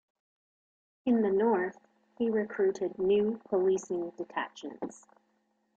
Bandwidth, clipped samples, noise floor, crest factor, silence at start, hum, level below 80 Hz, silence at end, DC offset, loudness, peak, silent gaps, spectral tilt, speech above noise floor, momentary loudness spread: 8 kHz; under 0.1%; -75 dBFS; 14 dB; 1.05 s; none; -72 dBFS; 0.8 s; under 0.1%; -31 LUFS; -18 dBFS; none; -6 dB/octave; 45 dB; 13 LU